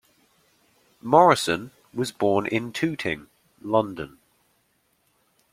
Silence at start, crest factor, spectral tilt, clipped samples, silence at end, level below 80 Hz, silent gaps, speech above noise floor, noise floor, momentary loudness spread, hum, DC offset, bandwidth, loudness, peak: 1.05 s; 24 dB; -5 dB/octave; under 0.1%; 1.45 s; -62 dBFS; none; 46 dB; -68 dBFS; 20 LU; none; under 0.1%; 16 kHz; -23 LUFS; -2 dBFS